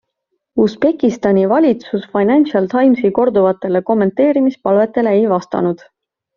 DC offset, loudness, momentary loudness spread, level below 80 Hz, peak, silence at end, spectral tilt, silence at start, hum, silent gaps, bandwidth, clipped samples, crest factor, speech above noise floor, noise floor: under 0.1%; -14 LUFS; 6 LU; -56 dBFS; -2 dBFS; 0.6 s; -6.5 dB/octave; 0.55 s; none; none; 7.2 kHz; under 0.1%; 12 dB; 59 dB; -72 dBFS